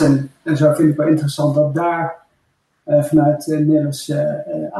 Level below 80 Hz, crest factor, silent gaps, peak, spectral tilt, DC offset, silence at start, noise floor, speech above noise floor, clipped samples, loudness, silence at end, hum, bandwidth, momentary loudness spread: -54 dBFS; 12 dB; none; -4 dBFS; -7.5 dB/octave; under 0.1%; 0 s; -65 dBFS; 49 dB; under 0.1%; -17 LUFS; 0 s; none; 12.5 kHz; 8 LU